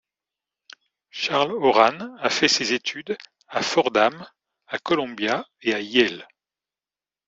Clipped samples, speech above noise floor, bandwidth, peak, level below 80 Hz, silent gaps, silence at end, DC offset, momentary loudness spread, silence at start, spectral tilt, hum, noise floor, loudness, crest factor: under 0.1%; over 68 dB; 8.2 kHz; -2 dBFS; -68 dBFS; none; 1.05 s; under 0.1%; 14 LU; 1.15 s; -3 dB/octave; none; under -90 dBFS; -22 LUFS; 22 dB